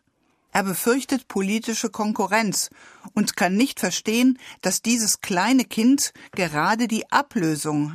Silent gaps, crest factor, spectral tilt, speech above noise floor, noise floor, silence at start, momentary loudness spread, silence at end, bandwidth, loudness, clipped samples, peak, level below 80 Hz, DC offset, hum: none; 18 dB; -3.5 dB/octave; 44 dB; -67 dBFS; 0.55 s; 6 LU; 0 s; 15.5 kHz; -22 LUFS; under 0.1%; -4 dBFS; -64 dBFS; under 0.1%; none